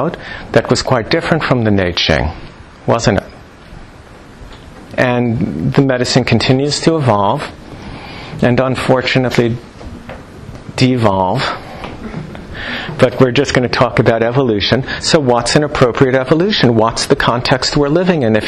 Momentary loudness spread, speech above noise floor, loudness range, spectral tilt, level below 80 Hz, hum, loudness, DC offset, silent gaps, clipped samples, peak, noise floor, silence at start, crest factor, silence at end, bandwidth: 16 LU; 24 dB; 6 LU; -5.5 dB/octave; -34 dBFS; none; -13 LUFS; under 0.1%; none; under 0.1%; 0 dBFS; -36 dBFS; 0 s; 14 dB; 0 s; 12.5 kHz